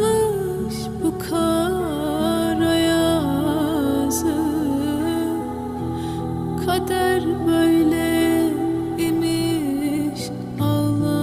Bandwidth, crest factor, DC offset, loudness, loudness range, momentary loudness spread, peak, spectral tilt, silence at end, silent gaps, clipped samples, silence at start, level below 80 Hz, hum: 16 kHz; 14 dB; under 0.1%; -21 LUFS; 3 LU; 8 LU; -8 dBFS; -5.5 dB/octave; 0 s; none; under 0.1%; 0 s; -44 dBFS; none